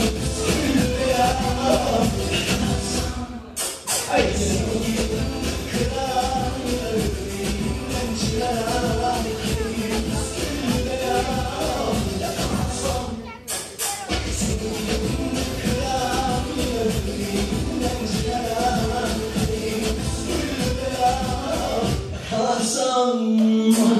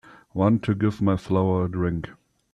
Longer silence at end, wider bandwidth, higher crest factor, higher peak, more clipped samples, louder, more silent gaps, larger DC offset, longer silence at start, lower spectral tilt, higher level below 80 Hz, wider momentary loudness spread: second, 0 s vs 0.4 s; first, 14.5 kHz vs 9 kHz; about the same, 18 dB vs 18 dB; about the same, -4 dBFS vs -6 dBFS; neither; about the same, -23 LUFS vs -24 LUFS; neither; neither; second, 0 s vs 0.35 s; second, -4.5 dB/octave vs -9 dB/octave; first, -32 dBFS vs -52 dBFS; second, 6 LU vs 11 LU